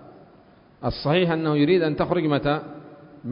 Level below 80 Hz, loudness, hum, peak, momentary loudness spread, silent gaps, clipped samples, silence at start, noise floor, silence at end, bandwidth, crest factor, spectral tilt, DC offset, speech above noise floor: -50 dBFS; -22 LUFS; none; -8 dBFS; 17 LU; none; under 0.1%; 0 s; -53 dBFS; 0 s; 5.4 kHz; 16 dB; -11.5 dB/octave; under 0.1%; 31 dB